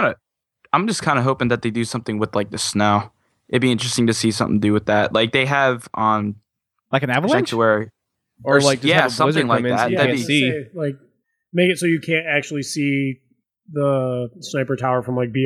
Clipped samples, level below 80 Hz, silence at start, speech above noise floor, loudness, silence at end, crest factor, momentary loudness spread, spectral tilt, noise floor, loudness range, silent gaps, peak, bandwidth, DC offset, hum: under 0.1%; -58 dBFS; 0 s; 43 dB; -19 LUFS; 0 s; 18 dB; 10 LU; -5 dB/octave; -61 dBFS; 4 LU; none; 0 dBFS; 14.5 kHz; under 0.1%; none